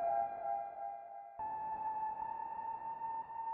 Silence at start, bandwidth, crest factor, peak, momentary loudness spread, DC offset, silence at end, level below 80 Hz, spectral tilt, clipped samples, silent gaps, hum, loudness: 0 s; 3.6 kHz; 14 dB; -26 dBFS; 8 LU; under 0.1%; 0 s; -76 dBFS; -5 dB/octave; under 0.1%; none; none; -42 LUFS